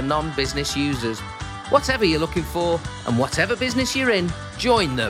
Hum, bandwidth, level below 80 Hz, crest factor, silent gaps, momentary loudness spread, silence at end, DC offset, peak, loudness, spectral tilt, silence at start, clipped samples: none; 16.5 kHz; -40 dBFS; 20 dB; none; 7 LU; 0 s; under 0.1%; -2 dBFS; -22 LUFS; -4.5 dB/octave; 0 s; under 0.1%